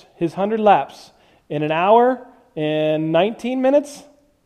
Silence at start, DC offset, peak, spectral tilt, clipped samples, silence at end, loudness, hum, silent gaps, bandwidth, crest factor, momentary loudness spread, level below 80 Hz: 0.2 s; under 0.1%; -2 dBFS; -6.5 dB/octave; under 0.1%; 0.45 s; -18 LUFS; none; none; 12.5 kHz; 18 dB; 14 LU; -62 dBFS